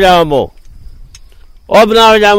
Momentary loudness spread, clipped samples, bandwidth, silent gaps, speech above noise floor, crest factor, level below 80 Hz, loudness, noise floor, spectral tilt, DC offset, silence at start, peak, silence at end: 10 LU; 0.5%; 16.5 kHz; none; 30 dB; 10 dB; -32 dBFS; -8 LUFS; -36 dBFS; -4 dB/octave; 0.4%; 0 s; 0 dBFS; 0 s